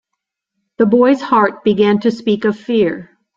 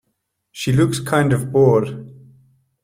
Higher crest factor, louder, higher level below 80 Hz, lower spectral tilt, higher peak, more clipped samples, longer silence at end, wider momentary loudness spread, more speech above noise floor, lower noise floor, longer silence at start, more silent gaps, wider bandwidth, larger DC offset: about the same, 14 dB vs 16 dB; first, -14 LUFS vs -17 LUFS; second, -56 dBFS vs -50 dBFS; about the same, -7.5 dB/octave vs -6.5 dB/octave; about the same, -2 dBFS vs -2 dBFS; neither; second, 0.35 s vs 0.7 s; second, 5 LU vs 13 LU; first, 64 dB vs 56 dB; first, -78 dBFS vs -73 dBFS; first, 0.8 s vs 0.55 s; neither; second, 7.4 kHz vs 16 kHz; neither